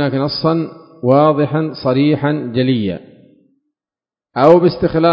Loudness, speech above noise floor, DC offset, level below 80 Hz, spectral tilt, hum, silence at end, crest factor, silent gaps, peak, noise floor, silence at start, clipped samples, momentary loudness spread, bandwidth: -14 LUFS; over 77 dB; under 0.1%; -48 dBFS; -9.5 dB/octave; none; 0 s; 14 dB; none; 0 dBFS; under -90 dBFS; 0 s; 0.1%; 12 LU; 6.2 kHz